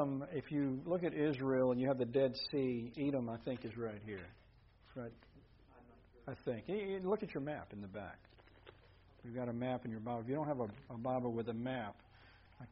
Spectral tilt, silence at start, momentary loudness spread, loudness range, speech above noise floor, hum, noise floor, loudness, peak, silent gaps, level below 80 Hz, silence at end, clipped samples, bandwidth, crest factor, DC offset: -6 dB/octave; 0 s; 15 LU; 10 LU; 26 dB; none; -65 dBFS; -40 LUFS; -22 dBFS; none; -68 dBFS; 0 s; under 0.1%; 5.6 kHz; 18 dB; under 0.1%